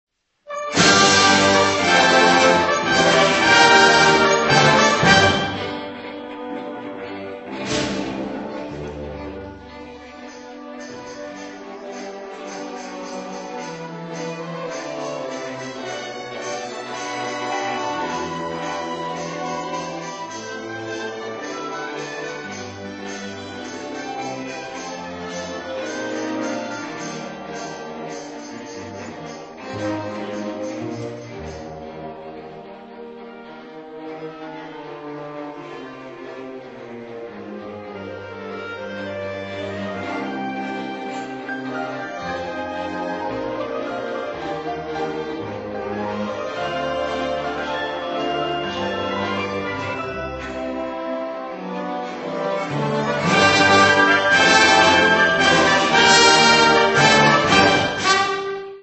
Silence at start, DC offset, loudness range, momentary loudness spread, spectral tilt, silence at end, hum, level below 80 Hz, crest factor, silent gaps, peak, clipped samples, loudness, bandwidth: 0.45 s; under 0.1%; 21 LU; 21 LU; -3 dB/octave; 0 s; none; -52 dBFS; 22 dB; none; 0 dBFS; under 0.1%; -19 LUFS; 8.4 kHz